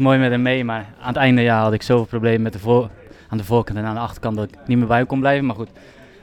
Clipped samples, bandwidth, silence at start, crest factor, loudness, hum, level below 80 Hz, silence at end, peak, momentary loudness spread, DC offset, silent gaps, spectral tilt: under 0.1%; 14.5 kHz; 0 s; 16 dB; -19 LUFS; none; -46 dBFS; 0.55 s; -4 dBFS; 11 LU; under 0.1%; none; -7.5 dB/octave